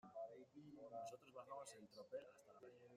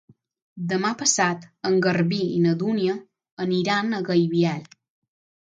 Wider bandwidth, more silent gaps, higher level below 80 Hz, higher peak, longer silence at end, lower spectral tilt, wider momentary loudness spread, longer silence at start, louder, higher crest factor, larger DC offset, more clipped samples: first, 15.5 kHz vs 9.4 kHz; second, none vs 3.32-3.37 s; second, under -90 dBFS vs -68 dBFS; second, -42 dBFS vs -4 dBFS; second, 0 s vs 0.75 s; about the same, -4.5 dB/octave vs -4.5 dB/octave; about the same, 10 LU vs 9 LU; second, 0.05 s vs 0.55 s; second, -58 LUFS vs -23 LUFS; about the same, 16 dB vs 20 dB; neither; neither